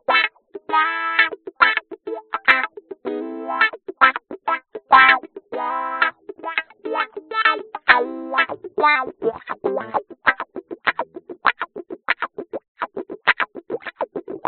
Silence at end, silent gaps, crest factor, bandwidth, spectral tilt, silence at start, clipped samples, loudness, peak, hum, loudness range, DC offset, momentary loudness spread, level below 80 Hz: 0 s; 12.68-12.75 s; 22 dB; 4.6 kHz; 1.5 dB/octave; 0.1 s; under 0.1%; -20 LUFS; 0 dBFS; none; 6 LU; under 0.1%; 14 LU; -62 dBFS